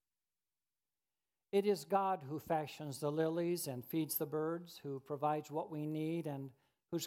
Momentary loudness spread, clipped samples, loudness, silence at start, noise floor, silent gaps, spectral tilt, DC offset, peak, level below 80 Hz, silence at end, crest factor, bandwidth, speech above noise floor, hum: 10 LU; under 0.1%; -39 LUFS; 1.55 s; under -90 dBFS; none; -5.5 dB/octave; under 0.1%; -20 dBFS; -84 dBFS; 0 s; 20 dB; 16.5 kHz; over 52 dB; none